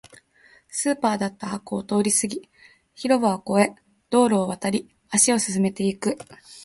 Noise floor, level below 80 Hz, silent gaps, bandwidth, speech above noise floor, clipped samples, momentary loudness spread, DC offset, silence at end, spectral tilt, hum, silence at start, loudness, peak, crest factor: -56 dBFS; -62 dBFS; none; 12 kHz; 34 dB; under 0.1%; 12 LU; under 0.1%; 0 s; -4 dB/octave; none; 0.75 s; -23 LUFS; -4 dBFS; 20 dB